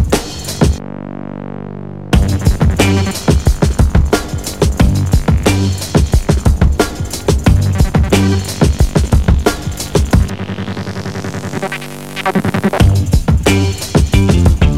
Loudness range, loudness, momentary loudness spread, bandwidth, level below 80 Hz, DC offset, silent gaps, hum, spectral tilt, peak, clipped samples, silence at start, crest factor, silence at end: 3 LU; -14 LUFS; 10 LU; 16 kHz; -18 dBFS; 1%; none; none; -6 dB/octave; 0 dBFS; under 0.1%; 0 s; 12 dB; 0 s